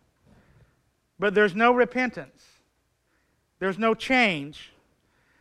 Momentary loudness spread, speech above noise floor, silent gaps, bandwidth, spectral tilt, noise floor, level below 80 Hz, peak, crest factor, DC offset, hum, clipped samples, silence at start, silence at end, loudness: 16 LU; 47 dB; none; 12 kHz; -5 dB/octave; -71 dBFS; -62 dBFS; -8 dBFS; 20 dB; under 0.1%; none; under 0.1%; 1.2 s; 0.75 s; -23 LUFS